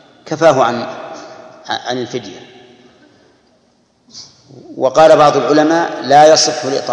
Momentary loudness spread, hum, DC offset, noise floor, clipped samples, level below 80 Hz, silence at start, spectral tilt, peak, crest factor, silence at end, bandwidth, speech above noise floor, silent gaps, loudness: 21 LU; none; under 0.1%; -55 dBFS; 0.6%; -58 dBFS; 0.25 s; -3.5 dB/octave; 0 dBFS; 14 dB; 0 s; 10.5 kHz; 44 dB; none; -11 LUFS